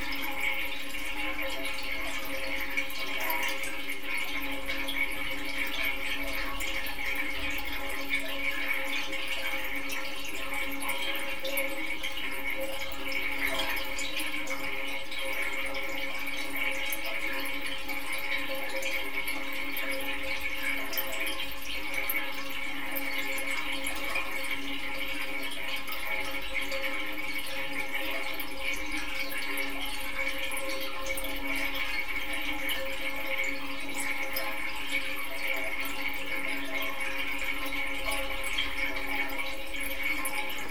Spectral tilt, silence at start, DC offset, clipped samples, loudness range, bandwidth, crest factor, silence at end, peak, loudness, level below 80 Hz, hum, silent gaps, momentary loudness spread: -2 dB/octave; 0 s; 3%; under 0.1%; 1 LU; 18 kHz; 18 dB; 0 s; -14 dBFS; -32 LUFS; -50 dBFS; none; none; 4 LU